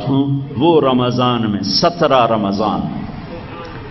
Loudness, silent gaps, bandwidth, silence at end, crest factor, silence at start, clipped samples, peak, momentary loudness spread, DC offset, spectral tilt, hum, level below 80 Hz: -15 LUFS; none; 6.2 kHz; 0 s; 16 dB; 0 s; under 0.1%; 0 dBFS; 17 LU; under 0.1%; -6.5 dB/octave; none; -42 dBFS